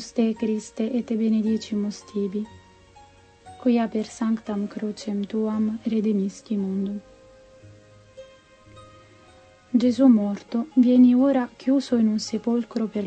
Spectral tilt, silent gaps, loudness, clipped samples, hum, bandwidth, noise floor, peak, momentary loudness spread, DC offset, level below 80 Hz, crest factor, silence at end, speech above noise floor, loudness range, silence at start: -6.5 dB/octave; none; -23 LUFS; under 0.1%; none; 8.6 kHz; -52 dBFS; -6 dBFS; 12 LU; under 0.1%; -64 dBFS; 16 dB; 0 s; 30 dB; 10 LU; 0 s